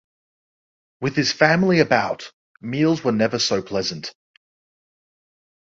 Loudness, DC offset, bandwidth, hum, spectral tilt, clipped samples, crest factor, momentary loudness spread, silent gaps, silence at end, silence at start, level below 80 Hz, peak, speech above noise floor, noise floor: -20 LUFS; under 0.1%; 7.8 kHz; none; -4.5 dB/octave; under 0.1%; 22 dB; 16 LU; 2.33-2.55 s; 1.5 s; 1 s; -58 dBFS; -2 dBFS; over 70 dB; under -90 dBFS